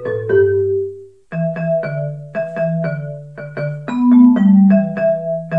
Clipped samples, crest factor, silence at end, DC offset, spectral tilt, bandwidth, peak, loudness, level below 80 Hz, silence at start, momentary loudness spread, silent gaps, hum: under 0.1%; 14 dB; 0 s; 0.2%; -10.5 dB/octave; 4.8 kHz; -2 dBFS; -15 LUFS; -62 dBFS; 0 s; 17 LU; none; none